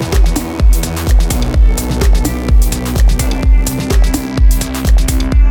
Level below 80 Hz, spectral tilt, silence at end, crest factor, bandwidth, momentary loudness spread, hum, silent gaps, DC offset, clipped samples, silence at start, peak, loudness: -10 dBFS; -5.5 dB/octave; 0 s; 10 dB; 18.5 kHz; 2 LU; none; none; under 0.1%; under 0.1%; 0 s; 0 dBFS; -14 LUFS